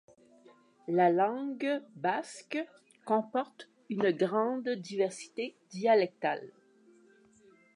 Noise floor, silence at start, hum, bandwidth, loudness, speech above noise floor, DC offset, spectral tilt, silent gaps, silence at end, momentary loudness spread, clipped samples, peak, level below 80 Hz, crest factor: -62 dBFS; 0.9 s; none; 11 kHz; -32 LUFS; 31 dB; under 0.1%; -5.5 dB/octave; none; 1.25 s; 13 LU; under 0.1%; -14 dBFS; -88 dBFS; 20 dB